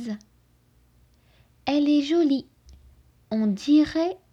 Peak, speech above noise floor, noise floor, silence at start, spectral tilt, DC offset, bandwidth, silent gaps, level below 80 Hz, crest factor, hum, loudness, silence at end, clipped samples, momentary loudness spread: -10 dBFS; 39 dB; -61 dBFS; 0 s; -6 dB/octave; under 0.1%; 7.8 kHz; none; -58 dBFS; 16 dB; 60 Hz at -60 dBFS; -23 LUFS; 0.15 s; under 0.1%; 13 LU